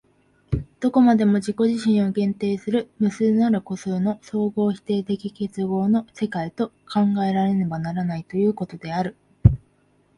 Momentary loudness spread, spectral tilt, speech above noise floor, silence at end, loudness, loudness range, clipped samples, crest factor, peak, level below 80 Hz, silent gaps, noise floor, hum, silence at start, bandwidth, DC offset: 9 LU; -8 dB/octave; 40 dB; 0.6 s; -22 LUFS; 4 LU; under 0.1%; 22 dB; 0 dBFS; -40 dBFS; none; -61 dBFS; none; 0.5 s; 11 kHz; under 0.1%